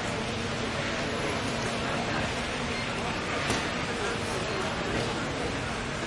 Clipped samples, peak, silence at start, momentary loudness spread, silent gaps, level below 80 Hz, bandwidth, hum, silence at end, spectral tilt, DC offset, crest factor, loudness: under 0.1%; -14 dBFS; 0 s; 2 LU; none; -46 dBFS; 11.5 kHz; none; 0 s; -4 dB/octave; under 0.1%; 16 dB; -30 LUFS